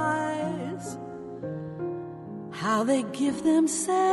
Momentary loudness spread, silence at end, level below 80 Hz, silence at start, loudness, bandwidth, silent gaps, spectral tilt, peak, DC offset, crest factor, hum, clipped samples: 15 LU; 0 s; -66 dBFS; 0 s; -28 LUFS; 11.5 kHz; none; -4.5 dB/octave; -12 dBFS; under 0.1%; 14 dB; none; under 0.1%